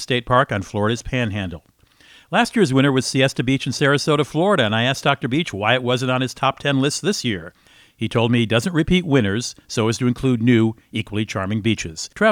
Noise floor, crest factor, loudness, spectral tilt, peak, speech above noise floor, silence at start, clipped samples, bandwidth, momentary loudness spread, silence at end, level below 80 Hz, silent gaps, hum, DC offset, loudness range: -50 dBFS; 18 dB; -19 LUFS; -5 dB/octave; -2 dBFS; 31 dB; 0 s; under 0.1%; 16.5 kHz; 8 LU; 0 s; -46 dBFS; none; none; under 0.1%; 2 LU